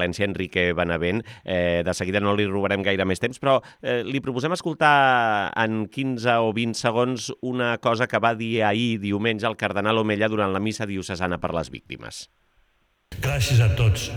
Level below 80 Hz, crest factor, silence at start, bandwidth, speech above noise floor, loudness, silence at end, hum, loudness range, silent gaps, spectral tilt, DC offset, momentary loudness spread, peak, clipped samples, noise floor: -46 dBFS; 20 dB; 0 s; 18.5 kHz; 43 dB; -23 LUFS; 0 s; none; 4 LU; none; -5.5 dB/octave; under 0.1%; 9 LU; -4 dBFS; under 0.1%; -65 dBFS